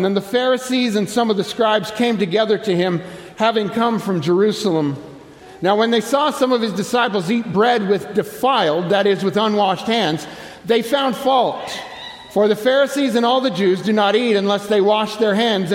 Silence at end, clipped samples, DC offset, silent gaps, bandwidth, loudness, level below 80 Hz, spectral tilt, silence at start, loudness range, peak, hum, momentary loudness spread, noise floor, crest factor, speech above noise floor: 0 s; under 0.1%; under 0.1%; none; 16.5 kHz; -17 LUFS; -60 dBFS; -5 dB/octave; 0 s; 2 LU; -2 dBFS; none; 6 LU; -39 dBFS; 14 dB; 22 dB